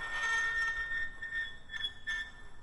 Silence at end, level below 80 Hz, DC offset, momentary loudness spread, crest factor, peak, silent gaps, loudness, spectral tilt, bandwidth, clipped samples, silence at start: 0 s; -52 dBFS; under 0.1%; 8 LU; 14 dB; -24 dBFS; none; -35 LUFS; -0.5 dB/octave; 11 kHz; under 0.1%; 0 s